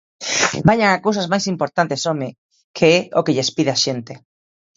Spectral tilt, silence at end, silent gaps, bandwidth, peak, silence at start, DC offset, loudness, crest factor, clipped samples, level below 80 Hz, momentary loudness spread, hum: -4 dB/octave; 0.6 s; 2.38-2.49 s, 2.64-2.74 s; 8 kHz; 0 dBFS; 0.2 s; under 0.1%; -17 LUFS; 18 dB; under 0.1%; -52 dBFS; 11 LU; none